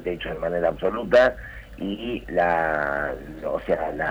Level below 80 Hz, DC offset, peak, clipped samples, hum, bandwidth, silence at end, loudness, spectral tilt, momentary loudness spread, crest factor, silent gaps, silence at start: -44 dBFS; under 0.1%; -8 dBFS; under 0.1%; none; over 20 kHz; 0 s; -24 LUFS; -6.5 dB/octave; 14 LU; 16 dB; none; 0 s